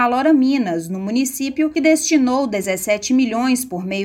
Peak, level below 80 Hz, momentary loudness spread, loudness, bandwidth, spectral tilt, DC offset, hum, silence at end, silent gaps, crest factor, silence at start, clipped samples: -4 dBFS; -56 dBFS; 7 LU; -18 LUFS; 17 kHz; -4 dB/octave; under 0.1%; none; 0 s; none; 14 dB; 0 s; under 0.1%